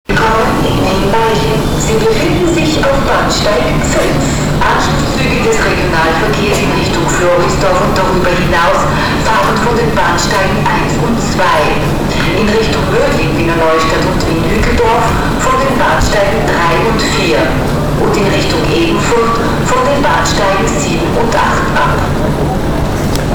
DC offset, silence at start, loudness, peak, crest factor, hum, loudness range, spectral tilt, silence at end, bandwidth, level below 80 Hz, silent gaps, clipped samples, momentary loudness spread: under 0.1%; 0.1 s; -11 LUFS; 0 dBFS; 10 dB; none; 1 LU; -5 dB/octave; 0 s; over 20 kHz; -20 dBFS; none; under 0.1%; 3 LU